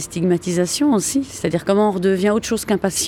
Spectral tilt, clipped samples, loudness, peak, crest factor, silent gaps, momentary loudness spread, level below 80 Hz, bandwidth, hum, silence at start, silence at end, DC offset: -4.5 dB/octave; under 0.1%; -19 LUFS; -4 dBFS; 14 dB; none; 5 LU; -50 dBFS; 18.5 kHz; none; 0 s; 0 s; under 0.1%